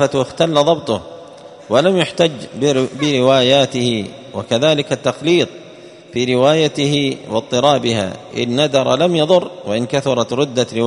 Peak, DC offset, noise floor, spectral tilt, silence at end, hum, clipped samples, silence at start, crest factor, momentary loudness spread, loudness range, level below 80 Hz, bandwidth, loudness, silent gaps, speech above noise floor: 0 dBFS; under 0.1%; -38 dBFS; -5 dB/octave; 0 s; none; under 0.1%; 0 s; 16 dB; 10 LU; 1 LU; -54 dBFS; 11 kHz; -16 LUFS; none; 23 dB